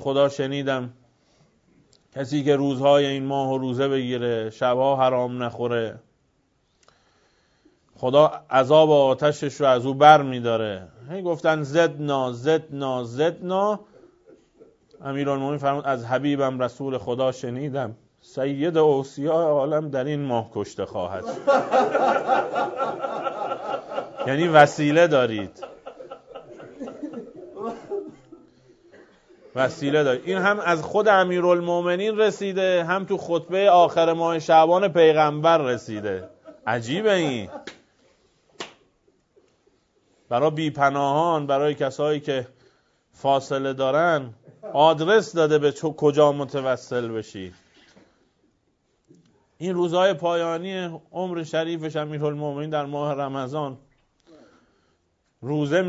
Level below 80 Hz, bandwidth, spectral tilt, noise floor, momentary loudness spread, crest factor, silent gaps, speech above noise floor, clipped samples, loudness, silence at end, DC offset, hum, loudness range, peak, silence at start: -66 dBFS; 8 kHz; -6 dB/octave; -69 dBFS; 16 LU; 22 dB; none; 47 dB; under 0.1%; -22 LUFS; 0 s; under 0.1%; none; 10 LU; 0 dBFS; 0 s